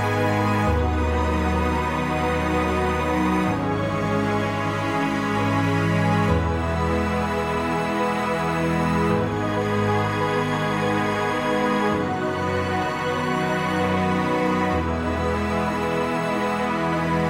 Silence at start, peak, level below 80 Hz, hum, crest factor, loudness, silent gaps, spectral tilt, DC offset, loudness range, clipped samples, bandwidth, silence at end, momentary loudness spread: 0 s; -6 dBFS; -36 dBFS; none; 16 dB; -23 LUFS; none; -6.5 dB/octave; under 0.1%; 1 LU; under 0.1%; 16.5 kHz; 0 s; 3 LU